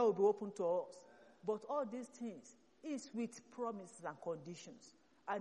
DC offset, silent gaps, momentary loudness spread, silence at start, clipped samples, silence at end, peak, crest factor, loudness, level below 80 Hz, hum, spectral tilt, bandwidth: under 0.1%; none; 17 LU; 0 s; under 0.1%; 0 s; -22 dBFS; 20 dB; -42 LUFS; -90 dBFS; none; -5.5 dB/octave; 11.5 kHz